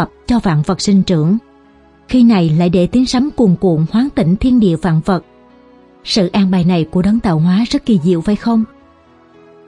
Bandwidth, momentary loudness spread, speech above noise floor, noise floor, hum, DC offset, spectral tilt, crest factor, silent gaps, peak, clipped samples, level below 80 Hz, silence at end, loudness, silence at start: 11 kHz; 5 LU; 34 dB; -46 dBFS; none; under 0.1%; -7 dB/octave; 12 dB; none; 0 dBFS; under 0.1%; -36 dBFS; 1.05 s; -13 LUFS; 0 s